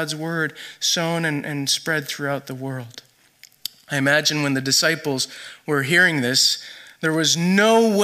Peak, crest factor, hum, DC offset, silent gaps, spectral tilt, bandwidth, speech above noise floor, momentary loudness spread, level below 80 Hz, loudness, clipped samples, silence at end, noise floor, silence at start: -4 dBFS; 18 dB; none; under 0.1%; none; -3 dB/octave; 15.5 kHz; 31 dB; 15 LU; -70 dBFS; -20 LUFS; under 0.1%; 0 s; -52 dBFS; 0 s